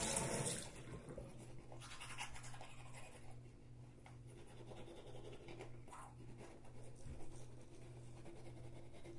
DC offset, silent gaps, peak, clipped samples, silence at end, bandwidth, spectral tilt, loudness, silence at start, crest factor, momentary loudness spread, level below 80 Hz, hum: under 0.1%; none; -26 dBFS; under 0.1%; 0 s; 11.5 kHz; -3.5 dB/octave; -52 LUFS; 0 s; 26 dB; 14 LU; -62 dBFS; none